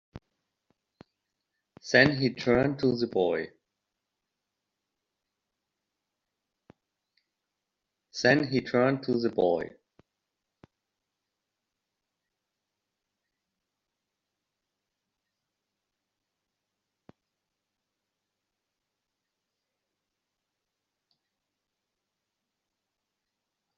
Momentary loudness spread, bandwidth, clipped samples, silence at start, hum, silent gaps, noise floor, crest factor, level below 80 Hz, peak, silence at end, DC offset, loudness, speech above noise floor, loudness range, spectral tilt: 14 LU; 7.4 kHz; under 0.1%; 0.15 s; none; none; -86 dBFS; 28 dB; -66 dBFS; -6 dBFS; 14.1 s; under 0.1%; -26 LUFS; 60 dB; 8 LU; -4 dB/octave